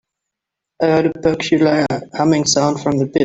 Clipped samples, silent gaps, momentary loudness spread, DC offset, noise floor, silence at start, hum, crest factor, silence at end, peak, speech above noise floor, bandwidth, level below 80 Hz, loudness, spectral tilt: under 0.1%; none; 5 LU; under 0.1%; -82 dBFS; 0.8 s; none; 14 dB; 0 s; -2 dBFS; 67 dB; 8.4 kHz; -52 dBFS; -16 LUFS; -5 dB/octave